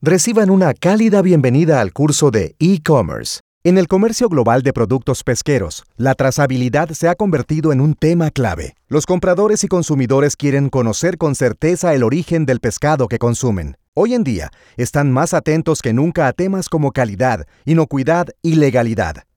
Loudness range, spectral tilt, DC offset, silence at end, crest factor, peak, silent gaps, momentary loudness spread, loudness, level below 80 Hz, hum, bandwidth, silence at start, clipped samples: 3 LU; -6 dB/octave; under 0.1%; 0.15 s; 14 dB; -2 dBFS; 3.40-3.61 s, 13.88-13.92 s; 7 LU; -15 LUFS; -40 dBFS; none; 18 kHz; 0 s; under 0.1%